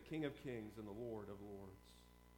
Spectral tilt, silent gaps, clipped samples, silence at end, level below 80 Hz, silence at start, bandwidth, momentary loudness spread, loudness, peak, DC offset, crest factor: -7 dB/octave; none; under 0.1%; 0 s; -68 dBFS; 0 s; 19 kHz; 17 LU; -51 LUFS; -30 dBFS; under 0.1%; 20 dB